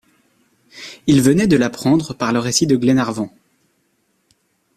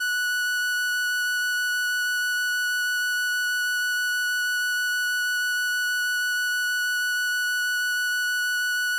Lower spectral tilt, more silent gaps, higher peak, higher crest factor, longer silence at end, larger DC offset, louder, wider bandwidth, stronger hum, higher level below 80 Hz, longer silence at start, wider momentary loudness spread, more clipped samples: first, -5 dB/octave vs 6.5 dB/octave; neither; first, -2 dBFS vs -22 dBFS; first, 18 dB vs 4 dB; first, 1.5 s vs 0 s; neither; first, -16 LUFS vs -23 LUFS; second, 14.5 kHz vs 17 kHz; second, none vs 50 Hz at -75 dBFS; first, -50 dBFS vs -78 dBFS; first, 0.75 s vs 0 s; first, 14 LU vs 0 LU; neither